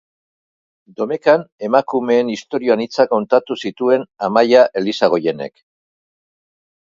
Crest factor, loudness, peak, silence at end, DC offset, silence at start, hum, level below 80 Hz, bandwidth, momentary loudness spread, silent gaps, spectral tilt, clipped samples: 18 dB; -16 LUFS; 0 dBFS; 1.35 s; under 0.1%; 1 s; none; -66 dBFS; 7.6 kHz; 10 LU; 1.52-1.59 s; -5.5 dB/octave; under 0.1%